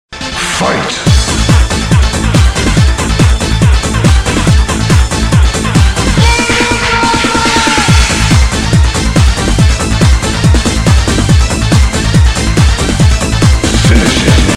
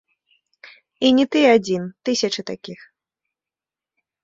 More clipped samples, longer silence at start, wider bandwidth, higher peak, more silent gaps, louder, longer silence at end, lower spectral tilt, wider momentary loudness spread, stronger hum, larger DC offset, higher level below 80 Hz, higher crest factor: first, 0.4% vs under 0.1%; second, 0.1 s vs 1 s; first, 13.5 kHz vs 7.8 kHz; about the same, 0 dBFS vs -2 dBFS; neither; first, -9 LUFS vs -18 LUFS; second, 0 s vs 1.5 s; about the same, -4.5 dB/octave vs -4 dB/octave; second, 2 LU vs 17 LU; neither; neither; first, -12 dBFS vs -64 dBFS; second, 8 dB vs 20 dB